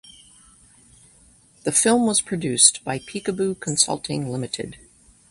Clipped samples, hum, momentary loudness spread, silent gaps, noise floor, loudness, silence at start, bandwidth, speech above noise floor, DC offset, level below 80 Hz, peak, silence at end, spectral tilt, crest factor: under 0.1%; none; 15 LU; none; -54 dBFS; -20 LUFS; 1.65 s; 11.5 kHz; 32 dB; under 0.1%; -58 dBFS; 0 dBFS; 0.55 s; -2.5 dB/octave; 24 dB